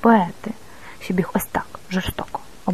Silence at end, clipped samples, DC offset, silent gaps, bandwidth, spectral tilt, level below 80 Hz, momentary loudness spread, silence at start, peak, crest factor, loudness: 0 s; under 0.1%; 1%; none; 14 kHz; -6 dB/octave; -44 dBFS; 17 LU; 0.05 s; -2 dBFS; 20 dB; -24 LUFS